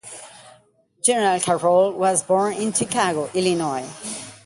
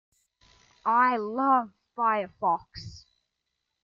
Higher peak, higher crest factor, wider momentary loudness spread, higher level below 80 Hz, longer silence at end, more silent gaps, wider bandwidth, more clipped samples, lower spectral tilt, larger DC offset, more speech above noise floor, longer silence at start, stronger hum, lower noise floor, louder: first, -4 dBFS vs -12 dBFS; about the same, 18 dB vs 18 dB; second, 13 LU vs 19 LU; about the same, -64 dBFS vs -62 dBFS; second, 0.1 s vs 0.85 s; neither; first, 11.5 kHz vs 7.4 kHz; neither; second, -3.5 dB/octave vs -6 dB/octave; neither; second, 37 dB vs 56 dB; second, 0.05 s vs 0.85 s; neither; second, -57 dBFS vs -82 dBFS; first, -20 LUFS vs -26 LUFS